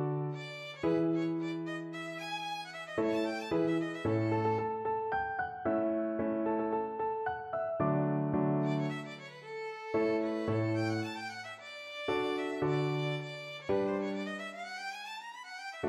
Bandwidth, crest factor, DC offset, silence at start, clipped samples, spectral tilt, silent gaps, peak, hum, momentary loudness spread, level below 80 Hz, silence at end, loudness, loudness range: 12 kHz; 16 dB; under 0.1%; 0 s; under 0.1%; -7 dB/octave; none; -18 dBFS; none; 10 LU; -68 dBFS; 0 s; -34 LUFS; 2 LU